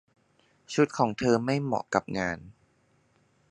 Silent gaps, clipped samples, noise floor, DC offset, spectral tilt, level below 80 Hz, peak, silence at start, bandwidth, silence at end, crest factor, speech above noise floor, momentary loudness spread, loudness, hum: none; under 0.1%; -67 dBFS; under 0.1%; -6 dB/octave; -60 dBFS; -6 dBFS; 0.7 s; 11 kHz; 1 s; 24 dB; 40 dB; 8 LU; -28 LUFS; none